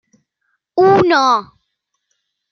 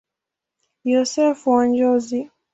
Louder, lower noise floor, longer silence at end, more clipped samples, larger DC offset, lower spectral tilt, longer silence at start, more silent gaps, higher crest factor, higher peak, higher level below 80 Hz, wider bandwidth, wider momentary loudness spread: first, -13 LUFS vs -19 LUFS; second, -72 dBFS vs -85 dBFS; first, 1.1 s vs 0.25 s; neither; neither; first, -5.5 dB/octave vs -4 dB/octave; about the same, 0.75 s vs 0.85 s; neither; about the same, 16 dB vs 16 dB; about the same, -2 dBFS vs -4 dBFS; first, -56 dBFS vs -66 dBFS; second, 6.6 kHz vs 8 kHz; about the same, 8 LU vs 10 LU